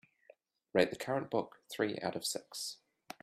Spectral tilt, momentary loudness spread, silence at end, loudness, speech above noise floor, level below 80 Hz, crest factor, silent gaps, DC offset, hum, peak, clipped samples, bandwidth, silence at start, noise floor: -3.5 dB/octave; 12 LU; 0.5 s; -37 LUFS; 29 dB; -76 dBFS; 24 dB; none; under 0.1%; none; -14 dBFS; under 0.1%; 15.5 kHz; 0.75 s; -65 dBFS